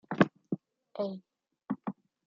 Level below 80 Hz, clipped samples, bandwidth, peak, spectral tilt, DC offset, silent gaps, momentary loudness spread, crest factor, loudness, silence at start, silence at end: -68 dBFS; under 0.1%; 7.2 kHz; -8 dBFS; -6 dB/octave; under 0.1%; none; 16 LU; 28 dB; -35 LUFS; 0.1 s; 0.35 s